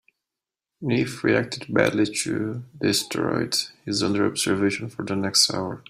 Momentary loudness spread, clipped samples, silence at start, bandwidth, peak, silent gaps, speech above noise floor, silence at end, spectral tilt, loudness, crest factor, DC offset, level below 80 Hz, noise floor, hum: 8 LU; under 0.1%; 0.8 s; 16 kHz; -4 dBFS; none; 64 dB; 0.1 s; -3.5 dB/octave; -23 LUFS; 22 dB; under 0.1%; -62 dBFS; -88 dBFS; none